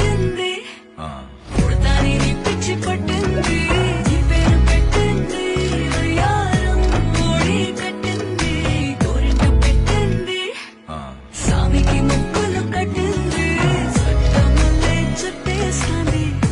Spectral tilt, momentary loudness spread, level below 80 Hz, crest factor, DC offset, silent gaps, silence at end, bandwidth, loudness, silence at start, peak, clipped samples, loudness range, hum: -5.5 dB/octave; 8 LU; -20 dBFS; 12 dB; under 0.1%; none; 0 s; 11.5 kHz; -18 LUFS; 0 s; -4 dBFS; under 0.1%; 2 LU; none